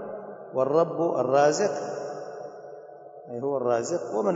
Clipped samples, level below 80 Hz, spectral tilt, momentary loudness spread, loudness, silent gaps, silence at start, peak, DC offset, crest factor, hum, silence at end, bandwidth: under 0.1%; -76 dBFS; -5 dB/octave; 22 LU; -26 LUFS; none; 0 s; -8 dBFS; under 0.1%; 18 dB; none; 0 s; 8 kHz